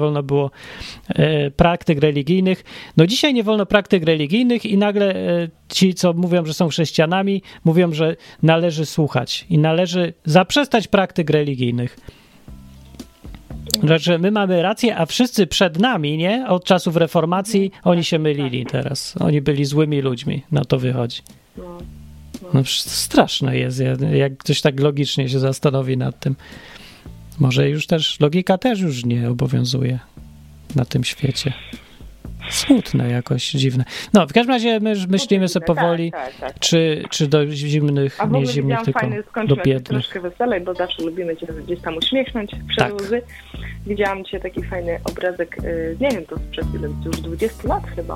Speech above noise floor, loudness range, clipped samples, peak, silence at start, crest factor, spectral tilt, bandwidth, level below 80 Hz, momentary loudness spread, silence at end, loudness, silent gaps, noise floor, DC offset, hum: 23 dB; 5 LU; under 0.1%; 0 dBFS; 0 s; 18 dB; -5.5 dB/octave; 16 kHz; -40 dBFS; 10 LU; 0 s; -19 LUFS; none; -41 dBFS; under 0.1%; none